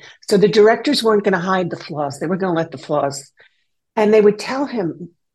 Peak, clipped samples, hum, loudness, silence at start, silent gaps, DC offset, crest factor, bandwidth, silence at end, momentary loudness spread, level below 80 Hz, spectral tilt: -2 dBFS; under 0.1%; none; -17 LUFS; 0.05 s; none; under 0.1%; 16 dB; 12.5 kHz; 0.25 s; 12 LU; -64 dBFS; -5.5 dB/octave